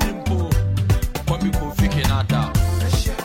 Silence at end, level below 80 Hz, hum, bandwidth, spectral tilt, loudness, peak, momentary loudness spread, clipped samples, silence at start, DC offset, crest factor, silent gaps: 0 s; -24 dBFS; none; 16.5 kHz; -6 dB/octave; -21 LUFS; -6 dBFS; 3 LU; under 0.1%; 0 s; under 0.1%; 12 dB; none